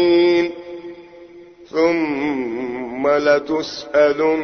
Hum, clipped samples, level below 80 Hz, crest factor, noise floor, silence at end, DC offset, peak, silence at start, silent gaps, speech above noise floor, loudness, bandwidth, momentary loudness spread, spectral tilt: none; under 0.1%; -56 dBFS; 16 dB; -42 dBFS; 0 s; under 0.1%; -2 dBFS; 0 s; none; 25 dB; -18 LUFS; 6.6 kHz; 15 LU; -5.5 dB/octave